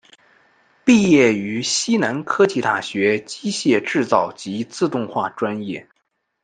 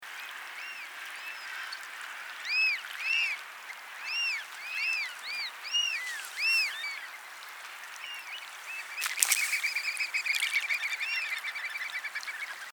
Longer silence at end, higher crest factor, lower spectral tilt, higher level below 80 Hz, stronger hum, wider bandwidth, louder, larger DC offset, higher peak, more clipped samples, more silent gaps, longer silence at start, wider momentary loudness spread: first, 0.6 s vs 0 s; second, 18 dB vs 34 dB; first, -4.5 dB/octave vs 5 dB/octave; first, -60 dBFS vs under -90 dBFS; neither; second, 9.6 kHz vs over 20 kHz; first, -19 LUFS vs -31 LUFS; neither; about the same, -2 dBFS vs 0 dBFS; neither; neither; first, 0.85 s vs 0 s; second, 11 LU vs 14 LU